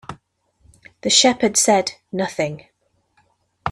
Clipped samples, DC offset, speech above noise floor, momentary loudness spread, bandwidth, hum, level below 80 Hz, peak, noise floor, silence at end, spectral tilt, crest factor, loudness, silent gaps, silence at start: under 0.1%; under 0.1%; 47 dB; 17 LU; 14 kHz; none; -56 dBFS; -2 dBFS; -64 dBFS; 0 s; -2 dB/octave; 20 dB; -17 LUFS; none; 0.1 s